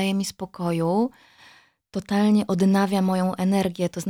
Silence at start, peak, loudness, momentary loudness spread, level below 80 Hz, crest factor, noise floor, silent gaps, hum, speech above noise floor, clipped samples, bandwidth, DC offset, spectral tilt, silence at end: 0 s; -8 dBFS; -23 LUFS; 10 LU; -62 dBFS; 14 dB; -54 dBFS; none; none; 32 dB; under 0.1%; 16 kHz; under 0.1%; -6.5 dB/octave; 0 s